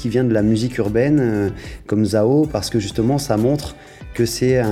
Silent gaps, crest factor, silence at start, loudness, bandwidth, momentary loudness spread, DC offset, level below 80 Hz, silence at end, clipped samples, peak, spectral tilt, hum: none; 14 dB; 0 s; -18 LUFS; 15 kHz; 8 LU; under 0.1%; -40 dBFS; 0 s; under 0.1%; -4 dBFS; -6.5 dB/octave; none